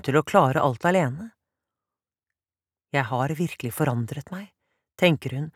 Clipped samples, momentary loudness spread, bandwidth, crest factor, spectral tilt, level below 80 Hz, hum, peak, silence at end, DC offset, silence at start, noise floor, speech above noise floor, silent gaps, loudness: under 0.1%; 17 LU; 16.5 kHz; 22 dB; -6.5 dB/octave; -64 dBFS; none; -2 dBFS; 0.05 s; under 0.1%; 0.05 s; under -90 dBFS; over 66 dB; none; -24 LUFS